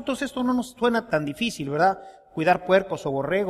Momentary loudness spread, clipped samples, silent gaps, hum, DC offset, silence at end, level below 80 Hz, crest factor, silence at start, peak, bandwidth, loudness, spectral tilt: 7 LU; under 0.1%; none; none; under 0.1%; 0 s; -56 dBFS; 18 dB; 0 s; -6 dBFS; 15 kHz; -24 LUFS; -5.5 dB/octave